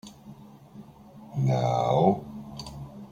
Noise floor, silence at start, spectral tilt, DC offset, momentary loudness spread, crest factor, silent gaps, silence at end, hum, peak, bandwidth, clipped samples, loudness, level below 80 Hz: -49 dBFS; 0.05 s; -7.5 dB/octave; under 0.1%; 25 LU; 20 dB; none; 0.05 s; none; -8 dBFS; 9.8 kHz; under 0.1%; -25 LUFS; -56 dBFS